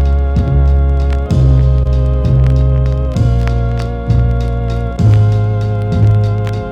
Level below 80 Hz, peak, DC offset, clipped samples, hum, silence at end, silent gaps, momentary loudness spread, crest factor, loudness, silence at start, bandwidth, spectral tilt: -14 dBFS; -4 dBFS; under 0.1%; under 0.1%; none; 0 s; none; 6 LU; 8 dB; -13 LUFS; 0 s; 6.8 kHz; -9 dB/octave